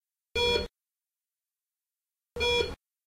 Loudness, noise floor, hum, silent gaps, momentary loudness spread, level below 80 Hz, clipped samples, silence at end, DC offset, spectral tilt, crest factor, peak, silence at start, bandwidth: -28 LUFS; under -90 dBFS; none; none; 13 LU; -48 dBFS; under 0.1%; 0.35 s; under 0.1%; -3 dB/octave; 20 dB; -14 dBFS; 0.35 s; 16 kHz